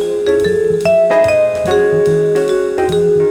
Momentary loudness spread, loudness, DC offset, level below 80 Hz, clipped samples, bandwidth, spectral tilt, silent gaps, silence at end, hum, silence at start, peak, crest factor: 4 LU; -13 LUFS; under 0.1%; -42 dBFS; under 0.1%; 13.5 kHz; -6 dB/octave; none; 0 s; none; 0 s; -2 dBFS; 10 dB